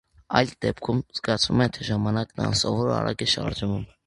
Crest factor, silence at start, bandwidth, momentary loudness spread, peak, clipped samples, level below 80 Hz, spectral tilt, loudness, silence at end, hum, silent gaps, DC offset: 24 dB; 0.3 s; 11.5 kHz; 6 LU; 0 dBFS; under 0.1%; -46 dBFS; -5 dB/octave; -25 LUFS; 0.2 s; none; none; under 0.1%